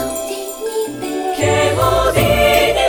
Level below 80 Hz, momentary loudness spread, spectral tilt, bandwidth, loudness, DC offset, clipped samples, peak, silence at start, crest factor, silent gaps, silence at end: -30 dBFS; 11 LU; -4 dB/octave; 19.5 kHz; -16 LUFS; under 0.1%; under 0.1%; -2 dBFS; 0 s; 14 dB; none; 0 s